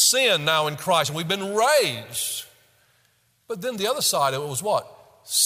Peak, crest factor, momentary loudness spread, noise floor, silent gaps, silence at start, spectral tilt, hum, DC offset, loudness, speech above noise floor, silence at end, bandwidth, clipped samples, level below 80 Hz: -6 dBFS; 18 dB; 9 LU; -64 dBFS; none; 0 s; -1.5 dB/octave; none; under 0.1%; -22 LUFS; 41 dB; 0 s; 16 kHz; under 0.1%; -70 dBFS